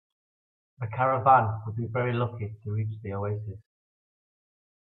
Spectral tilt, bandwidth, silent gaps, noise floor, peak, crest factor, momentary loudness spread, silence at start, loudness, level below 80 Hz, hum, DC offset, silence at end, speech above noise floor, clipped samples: -11 dB/octave; 4.1 kHz; none; under -90 dBFS; -8 dBFS; 22 dB; 16 LU; 0.8 s; -27 LUFS; -68 dBFS; none; under 0.1%; 1.35 s; over 63 dB; under 0.1%